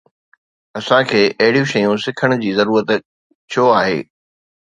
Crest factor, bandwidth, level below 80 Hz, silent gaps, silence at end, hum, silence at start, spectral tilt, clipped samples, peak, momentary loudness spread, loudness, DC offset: 16 dB; 9 kHz; -58 dBFS; 3.05-3.48 s; 0.65 s; none; 0.75 s; -5.5 dB/octave; under 0.1%; 0 dBFS; 9 LU; -15 LUFS; under 0.1%